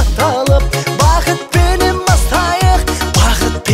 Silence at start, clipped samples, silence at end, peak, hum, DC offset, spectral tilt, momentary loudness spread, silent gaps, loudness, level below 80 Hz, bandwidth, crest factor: 0 s; under 0.1%; 0 s; 0 dBFS; none; under 0.1%; -4.5 dB/octave; 3 LU; none; -12 LUFS; -16 dBFS; 16.5 kHz; 12 dB